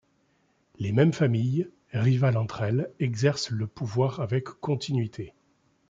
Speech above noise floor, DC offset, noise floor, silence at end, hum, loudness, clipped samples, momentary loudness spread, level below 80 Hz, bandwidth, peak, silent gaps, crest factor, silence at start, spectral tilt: 43 dB; under 0.1%; -68 dBFS; 0.6 s; none; -27 LUFS; under 0.1%; 9 LU; -64 dBFS; 7.8 kHz; -8 dBFS; none; 18 dB; 0.8 s; -7 dB/octave